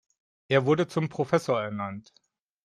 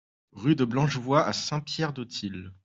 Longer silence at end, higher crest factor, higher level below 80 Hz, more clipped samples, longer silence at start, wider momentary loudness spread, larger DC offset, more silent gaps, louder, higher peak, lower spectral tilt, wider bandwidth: first, 0.65 s vs 0.1 s; about the same, 20 dB vs 20 dB; second, -68 dBFS vs -62 dBFS; neither; first, 0.5 s vs 0.35 s; about the same, 12 LU vs 10 LU; neither; neither; about the same, -27 LUFS vs -27 LUFS; about the same, -8 dBFS vs -8 dBFS; about the same, -6.5 dB/octave vs -5.5 dB/octave; first, 13 kHz vs 7.8 kHz